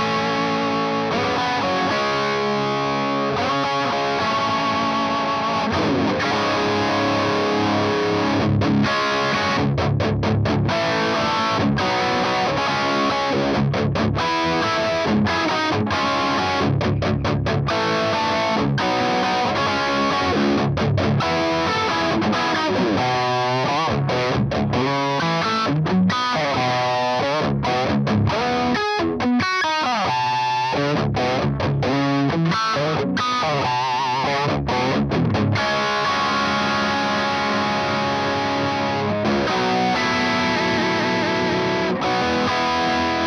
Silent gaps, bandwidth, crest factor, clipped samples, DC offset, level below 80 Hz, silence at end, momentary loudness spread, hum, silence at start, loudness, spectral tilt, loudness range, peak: none; 11 kHz; 12 dB; under 0.1%; under 0.1%; -44 dBFS; 0 s; 2 LU; none; 0 s; -20 LUFS; -5.5 dB/octave; 1 LU; -8 dBFS